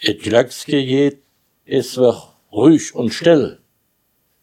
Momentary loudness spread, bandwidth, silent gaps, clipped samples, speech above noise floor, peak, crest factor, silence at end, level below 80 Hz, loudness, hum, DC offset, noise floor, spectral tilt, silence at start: 9 LU; 15.5 kHz; none; under 0.1%; 50 dB; 0 dBFS; 18 dB; 0.9 s; -62 dBFS; -16 LUFS; none; under 0.1%; -65 dBFS; -5.5 dB/octave; 0 s